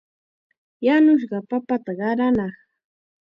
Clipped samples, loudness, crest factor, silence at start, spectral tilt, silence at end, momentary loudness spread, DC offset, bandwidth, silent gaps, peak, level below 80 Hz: under 0.1%; -20 LUFS; 14 dB; 0.8 s; -8.5 dB/octave; 0.8 s; 10 LU; under 0.1%; 5.6 kHz; none; -8 dBFS; -60 dBFS